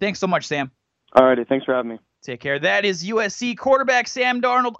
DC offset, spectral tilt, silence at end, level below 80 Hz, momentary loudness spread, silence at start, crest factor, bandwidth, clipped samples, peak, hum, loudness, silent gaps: under 0.1%; -4 dB/octave; 0.05 s; -62 dBFS; 13 LU; 0 s; 20 dB; 8 kHz; under 0.1%; 0 dBFS; none; -20 LUFS; none